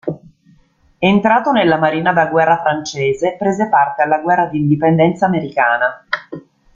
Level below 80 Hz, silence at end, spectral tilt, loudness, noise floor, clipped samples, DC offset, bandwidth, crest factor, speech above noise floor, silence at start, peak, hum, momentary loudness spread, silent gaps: -54 dBFS; 0.35 s; -6.5 dB/octave; -15 LUFS; -53 dBFS; under 0.1%; under 0.1%; 7.6 kHz; 14 dB; 39 dB; 0.05 s; 0 dBFS; none; 11 LU; none